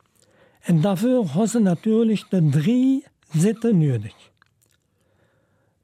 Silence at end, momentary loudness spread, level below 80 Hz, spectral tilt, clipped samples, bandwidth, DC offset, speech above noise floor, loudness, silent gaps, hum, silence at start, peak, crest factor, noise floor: 1.75 s; 8 LU; -68 dBFS; -7.5 dB/octave; under 0.1%; 14.5 kHz; under 0.1%; 46 dB; -20 LUFS; none; none; 0.65 s; -10 dBFS; 12 dB; -65 dBFS